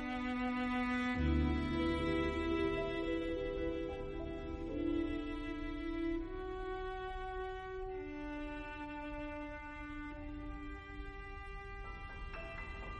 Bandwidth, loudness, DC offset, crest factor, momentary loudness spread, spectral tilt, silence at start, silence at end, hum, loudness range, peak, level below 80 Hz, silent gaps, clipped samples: 10 kHz; -40 LUFS; under 0.1%; 16 dB; 13 LU; -7.5 dB/octave; 0 s; 0 s; none; 11 LU; -22 dBFS; -46 dBFS; none; under 0.1%